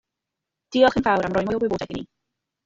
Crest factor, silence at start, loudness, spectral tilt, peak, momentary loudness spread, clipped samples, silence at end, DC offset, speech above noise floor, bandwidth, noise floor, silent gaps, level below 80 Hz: 20 dB; 0.7 s; -21 LUFS; -6 dB/octave; -4 dBFS; 13 LU; under 0.1%; 0.6 s; under 0.1%; 63 dB; 7.8 kHz; -84 dBFS; none; -50 dBFS